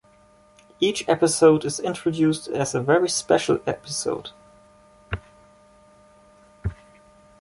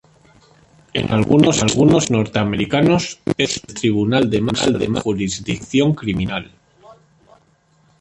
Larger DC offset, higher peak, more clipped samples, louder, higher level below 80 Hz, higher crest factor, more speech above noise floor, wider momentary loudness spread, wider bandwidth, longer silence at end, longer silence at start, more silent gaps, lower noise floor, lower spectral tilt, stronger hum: neither; about the same, -4 dBFS vs -2 dBFS; neither; second, -22 LUFS vs -17 LUFS; about the same, -48 dBFS vs -44 dBFS; about the same, 20 dB vs 16 dB; second, 34 dB vs 40 dB; first, 17 LU vs 9 LU; about the same, 11.5 kHz vs 11 kHz; second, 0.65 s vs 1.1 s; second, 0.8 s vs 0.95 s; neither; about the same, -55 dBFS vs -57 dBFS; about the same, -4.5 dB/octave vs -5 dB/octave; neither